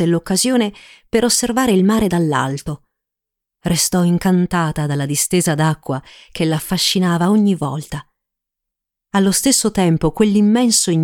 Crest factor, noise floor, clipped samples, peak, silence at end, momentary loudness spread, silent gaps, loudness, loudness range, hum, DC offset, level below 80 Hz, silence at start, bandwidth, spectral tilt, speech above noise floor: 16 dB; -83 dBFS; under 0.1%; 0 dBFS; 0 s; 12 LU; none; -16 LUFS; 2 LU; none; under 0.1%; -44 dBFS; 0 s; 18.5 kHz; -4.5 dB/octave; 67 dB